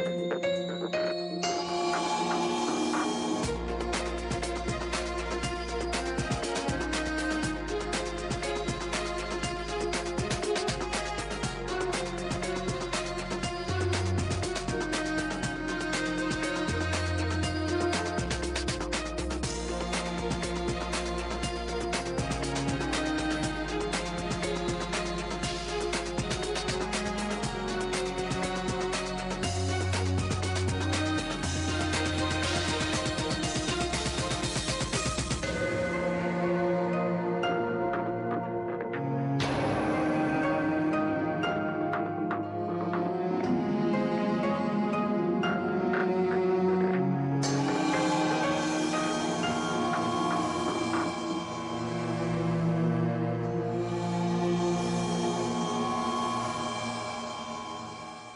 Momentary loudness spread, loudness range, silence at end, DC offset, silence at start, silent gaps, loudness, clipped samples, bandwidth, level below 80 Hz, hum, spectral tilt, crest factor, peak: 5 LU; 4 LU; 0 s; under 0.1%; 0 s; none; -30 LUFS; under 0.1%; 11.5 kHz; -44 dBFS; none; -5 dB/octave; 14 dB; -16 dBFS